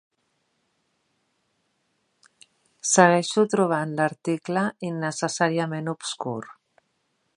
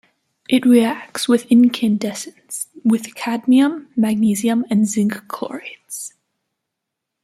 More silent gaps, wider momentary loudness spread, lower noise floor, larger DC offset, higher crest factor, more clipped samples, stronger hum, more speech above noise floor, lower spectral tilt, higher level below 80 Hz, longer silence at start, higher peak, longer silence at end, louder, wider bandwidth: neither; second, 13 LU vs 16 LU; second, -73 dBFS vs -80 dBFS; neither; first, 26 dB vs 16 dB; neither; neither; second, 49 dB vs 63 dB; about the same, -4 dB/octave vs -5 dB/octave; second, -76 dBFS vs -66 dBFS; first, 2.85 s vs 0.5 s; about the same, 0 dBFS vs -2 dBFS; second, 0.85 s vs 1.15 s; second, -23 LUFS vs -17 LUFS; second, 11 kHz vs 14.5 kHz